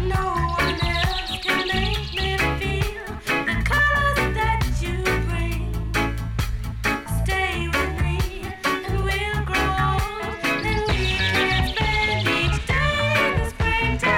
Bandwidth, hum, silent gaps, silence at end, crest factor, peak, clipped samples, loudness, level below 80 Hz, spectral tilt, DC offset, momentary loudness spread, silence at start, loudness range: 17 kHz; none; none; 0 s; 14 dB; -8 dBFS; under 0.1%; -22 LUFS; -28 dBFS; -5 dB/octave; under 0.1%; 6 LU; 0 s; 4 LU